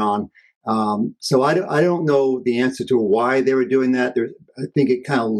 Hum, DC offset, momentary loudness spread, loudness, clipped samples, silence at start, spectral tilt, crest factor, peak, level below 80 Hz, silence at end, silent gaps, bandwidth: none; under 0.1%; 8 LU; -19 LUFS; under 0.1%; 0 s; -6.5 dB/octave; 14 dB; -4 dBFS; -64 dBFS; 0 s; 0.56-0.61 s; 12.5 kHz